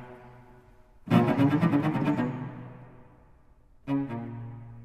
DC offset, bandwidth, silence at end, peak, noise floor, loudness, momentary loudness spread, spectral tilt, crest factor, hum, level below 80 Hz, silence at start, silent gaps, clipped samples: under 0.1%; 14 kHz; 0 s; -8 dBFS; -57 dBFS; -27 LUFS; 23 LU; -8.5 dB/octave; 20 dB; none; -58 dBFS; 0 s; none; under 0.1%